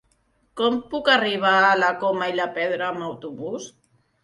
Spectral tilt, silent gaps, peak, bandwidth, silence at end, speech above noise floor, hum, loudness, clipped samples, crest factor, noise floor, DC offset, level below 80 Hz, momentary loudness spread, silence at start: -4 dB/octave; none; -4 dBFS; 11.5 kHz; 0.55 s; 43 dB; none; -21 LUFS; under 0.1%; 20 dB; -65 dBFS; under 0.1%; -64 dBFS; 16 LU; 0.55 s